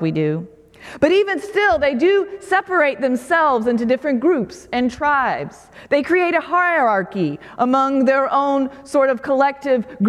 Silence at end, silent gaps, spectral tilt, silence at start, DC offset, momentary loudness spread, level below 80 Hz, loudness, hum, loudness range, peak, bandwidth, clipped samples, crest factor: 0 s; none; -6 dB/octave; 0 s; under 0.1%; 6 LU; -52 dBFS; -18 LUFS; none; 2 LU; -2 dBFS; 13 kHz; under 0.1%; 16 dB